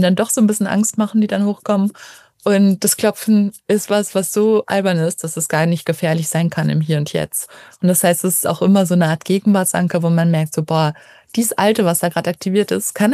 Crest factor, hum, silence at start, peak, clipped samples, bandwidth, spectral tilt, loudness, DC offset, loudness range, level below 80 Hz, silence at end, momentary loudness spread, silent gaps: 16 dB; none; 0 s; -2 dBFS; under 0.1%; 15.5 kHz; -5 dB/octave; -16 LUFS; under 0.1%; 2 LU; -62 dBFS; 0 s; 6 LU; none